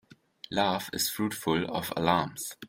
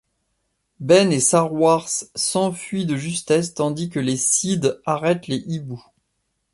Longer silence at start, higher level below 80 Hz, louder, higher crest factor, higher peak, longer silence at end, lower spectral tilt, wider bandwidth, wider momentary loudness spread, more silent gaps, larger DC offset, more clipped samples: second, 0.5 s vs 0.8 s; about the same, -62 dBFS vs -60 dBFS; second, -29 LUFS vs -20 LUFS; about the same, 22 dB vs 18 dB; second, -10 dBFS vs -4 dBFS; second, 0 s vs 0.75 s; about the same, -4 dB/octave vs -4 dB/octave; first, 16.5 kHz vs 11.5 kHz; second, 7 LU vs 10 LU; neither; neither; neither